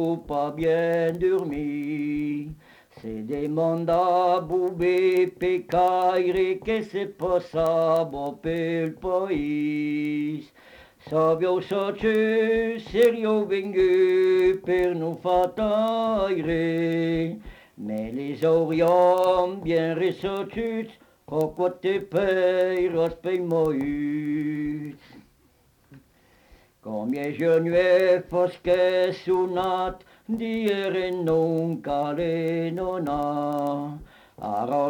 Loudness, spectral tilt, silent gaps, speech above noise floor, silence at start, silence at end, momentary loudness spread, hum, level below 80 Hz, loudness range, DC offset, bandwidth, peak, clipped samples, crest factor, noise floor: -24 LUFS; -7.5 dB/octave; none; 38 dB; 0 s; 0 s; 10 LU; none; -52 dBFS; 5 LU; under 0.1%; 18.5 kHz; -10 dBFS; under 0.1%; 14 dB; -61 dBFS